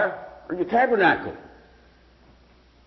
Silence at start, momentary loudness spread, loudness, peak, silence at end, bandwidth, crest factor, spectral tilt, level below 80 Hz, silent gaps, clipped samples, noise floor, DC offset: 0 s; 19 LU; -22 LUFS; -8 dBFS; 1.4 s; 6 kHz; 18 dB; -7.5 dB/octave; -56 dBFS; none; under 0.1%; -55 dBFS; under 0.1%